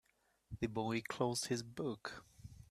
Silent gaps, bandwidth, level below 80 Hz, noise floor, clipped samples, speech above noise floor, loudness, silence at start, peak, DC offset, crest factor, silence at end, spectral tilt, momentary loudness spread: none; 15 kHz; -66 dBFS; -63 dBFS; under 0.1%; 22 dB; -41 LUFS; 0.5 s; -20 dBFS; under 0.1%; 22 dB; 0.05 s; -4.5 dB/octave; 17 LU